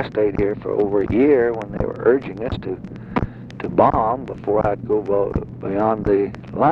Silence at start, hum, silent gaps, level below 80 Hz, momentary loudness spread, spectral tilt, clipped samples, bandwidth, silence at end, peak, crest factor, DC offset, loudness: 0 s; none; none; -38 dBFS; 11 LU; -9.5 dB/octave; under 0.1%; 5.8 kHz; 0 s; -2 dBFS; 18 dB; under 0.1%; -20 LUFS